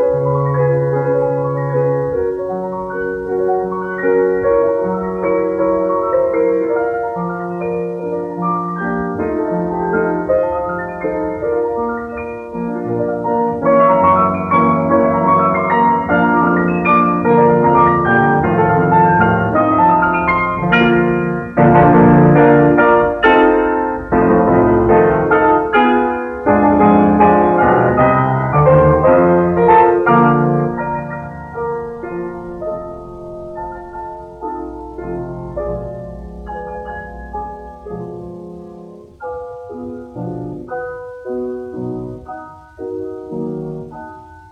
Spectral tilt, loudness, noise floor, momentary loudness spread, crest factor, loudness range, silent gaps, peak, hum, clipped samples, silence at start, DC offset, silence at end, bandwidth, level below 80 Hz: -9.5 dB/octave; -14 LUFS; -36 dBFS; 18 LU; 14 dB; 16 LU; none; 0 dBFS; none; under 0.1%; 0 s; under 0.1%; 0.1 s; 5.2 kHz; -38 dBFS